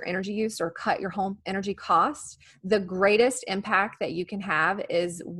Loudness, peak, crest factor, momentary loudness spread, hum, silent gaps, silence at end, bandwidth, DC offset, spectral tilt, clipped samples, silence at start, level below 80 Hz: -26 LUFS; -8 dBFS; 20 dB; 9 LU; none; none; 0 s; 12.5 kHz; under 0.1%; -4.5 dB/octave; under 0.1%; 0 s; -64 dBFS